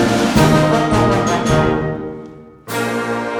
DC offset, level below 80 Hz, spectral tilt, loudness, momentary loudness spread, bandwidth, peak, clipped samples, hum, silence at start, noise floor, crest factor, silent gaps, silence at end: under 0.1%; -34 dBFS; -5.5 dB/octave; -15 LUFS; 13 LU; 19.5 kHz; 0 dBFS; under 0.1%; none; 0 s; -36 dBFS; 16 dB; none; 0 s